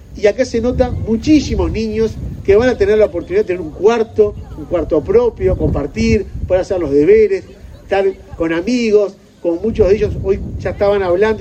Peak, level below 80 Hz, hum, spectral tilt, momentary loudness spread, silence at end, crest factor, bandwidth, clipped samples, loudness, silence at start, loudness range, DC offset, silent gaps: 0 dBFS; -30 dBFS; none; -7 dB/octave; 8 LU; 0 s; 14 dB; 8.4 kHz; under 0.1%; -15 LUFS; 0.05 s; 2 LU; under 0.1%; none